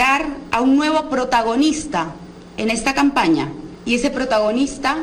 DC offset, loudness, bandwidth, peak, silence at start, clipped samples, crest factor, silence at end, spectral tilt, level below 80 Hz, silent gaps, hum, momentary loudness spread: under 0.1%; -18 LUFS; 13.5 kHz; -6 dBFS; 0 s; under 0.1%; 12 dB; 0 s; -4 dB/octave; -42 dBFS; none; none; 10 LU